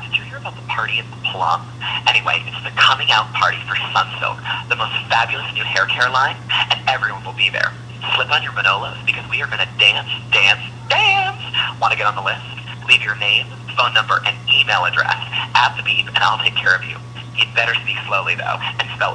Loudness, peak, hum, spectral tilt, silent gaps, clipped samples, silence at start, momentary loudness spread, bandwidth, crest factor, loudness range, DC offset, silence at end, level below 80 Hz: -16 LUFS; 0 dBFS; none; -2.5 dB/octave; none; under 0.1%; 0 s; 9 LU; 10.5 kHz; 18 dB; 2 LU; under 0.1%; 0 s; -52 dBFS